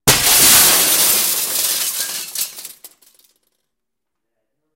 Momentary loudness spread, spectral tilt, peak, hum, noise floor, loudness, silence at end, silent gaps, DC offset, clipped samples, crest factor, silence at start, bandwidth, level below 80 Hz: 15 LU; 0 dB/octave; 0 dBFS; none; -81 dBFS; -12 LUFS; 1.9 s; none; under 0.1%; under 0.1%; 18 dB; 0.05 s; 17 kHz; -44 dBFS